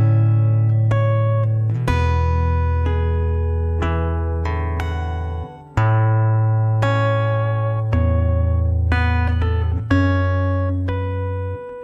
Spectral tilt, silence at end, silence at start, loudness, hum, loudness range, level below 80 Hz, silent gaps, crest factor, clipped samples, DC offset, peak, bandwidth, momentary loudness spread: -8.5 dB/octave; 0 s; 0 s; -19 LUFS; none; 3 LU; -26 dBFS; none; 14 dB; under 0.1%; under 0.1%; -2 dBFS; 6.2 kHz; 7 LU